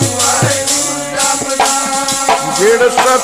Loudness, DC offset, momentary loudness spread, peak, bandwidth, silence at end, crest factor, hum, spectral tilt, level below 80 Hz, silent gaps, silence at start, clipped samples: -11 LUFS; 0.3%; 4 LU; 0 dBFS; 15.5 kHz; 0 s; 12 dB; none; -2.5 dB/octave; -46 dBFS; none; 0 s; under 0.1%